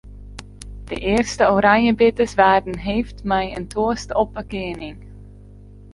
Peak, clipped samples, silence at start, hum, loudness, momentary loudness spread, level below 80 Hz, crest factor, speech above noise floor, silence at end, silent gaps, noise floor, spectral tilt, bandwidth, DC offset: -2 dBFS; under 0.1%; 0.05 s; 50 Hz at -40 dBFS; -19 LUFS; 23 LU; -38 dBFS; 18 dB; 23 dB; 0 s; none; -42 dBFS; -5 dB/octave; 11.5 kHz; under 0.1%